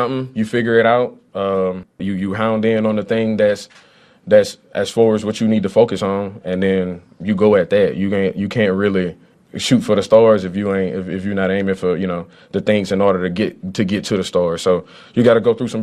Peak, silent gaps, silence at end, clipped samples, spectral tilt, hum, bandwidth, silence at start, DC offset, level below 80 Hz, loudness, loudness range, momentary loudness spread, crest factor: 0 dBFS; none; 0 s; under 0.1%; -6 dB/octave; none; 13 kHz; 0 s; under 0.1%; -54 dBFS; -17 LUFS; 3 LU; 10 LU; 16 dB